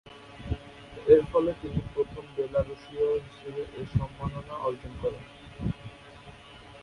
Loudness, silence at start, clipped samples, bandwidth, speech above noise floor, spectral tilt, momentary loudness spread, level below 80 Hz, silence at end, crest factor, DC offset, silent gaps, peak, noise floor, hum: -30 LUFS; 0.05 s; under 0.1%; 10.5 kHz; 21 dB; -8 dB/octave; 25 LU; -46 dBFS; 0 s; 24 dB; under 0.1%; none; -6 dBFS; -49 dBFS; none